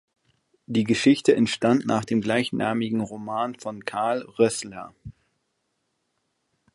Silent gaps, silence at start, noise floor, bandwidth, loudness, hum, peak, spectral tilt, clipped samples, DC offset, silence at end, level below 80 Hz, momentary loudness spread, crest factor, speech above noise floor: none; 0.7 s; -75 dBFS; 11.5 kHz; -24 LUFS; none; -4 dBFS; -5 dB/octave; under 0.1%; under 0.1%; 1.65 s; -62 dBFS; 12 LU; 20 dB; 52 dB